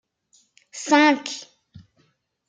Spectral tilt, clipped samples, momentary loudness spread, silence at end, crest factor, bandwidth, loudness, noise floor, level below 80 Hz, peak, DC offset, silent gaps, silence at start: -2 dB/octave; under 0.1%; 20 LU; 1.05 s; 22 dB; 9.4 kHz; -19 LUFS; -66 dBFS; -74 dBFS; -4 dBFS; under 0.1%; none; 0.75 s